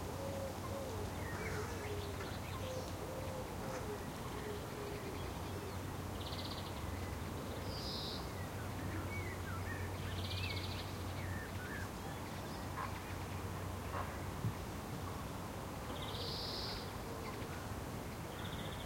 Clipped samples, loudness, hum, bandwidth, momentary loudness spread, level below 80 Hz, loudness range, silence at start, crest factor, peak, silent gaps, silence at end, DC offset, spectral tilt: under 0.1%; -44 LUFS; none; 16.5 kHz; 4 LU; -54 dBFS; 2 LU; 0 s; 16 dB; -28 dBFS; none; 0 s; under 0.1%; -5 dB/octave